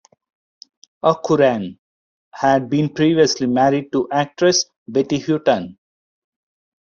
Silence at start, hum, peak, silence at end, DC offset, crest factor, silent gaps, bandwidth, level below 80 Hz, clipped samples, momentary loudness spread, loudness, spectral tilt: 1.05 s; none; -2 dBFS; 1.15 s; under 0.1%; 18 dB; 1.79-2.31 s, 4.76-4.86 s; 7.4 kHz; -58 dBFS; under 0.1%; 6 LU; -18 LUFS; -4.5 dB/octave